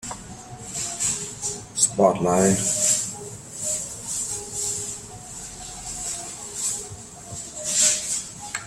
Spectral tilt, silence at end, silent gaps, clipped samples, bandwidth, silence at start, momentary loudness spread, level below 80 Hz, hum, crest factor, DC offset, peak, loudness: -2.5 dB/octave; 0 s; none; under 0.1%; 16 kHz; 0 s; 17 LU; -52 dBFS; none; 22 dB; under 0.1%; -4 dBFS; -23 LUFS